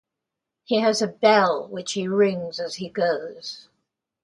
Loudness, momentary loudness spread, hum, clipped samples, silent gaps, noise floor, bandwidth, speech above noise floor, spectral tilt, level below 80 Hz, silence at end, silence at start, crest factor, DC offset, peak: -22 LUFS; 16 LU; none; under 0.1%; none; -84 dBFS; 11.5 kHz; 62 dB; -4 dB/octave; -70 dBFS; 0.65 s; 0.7 s; 20 dB; under 0.1%; -2 dBFS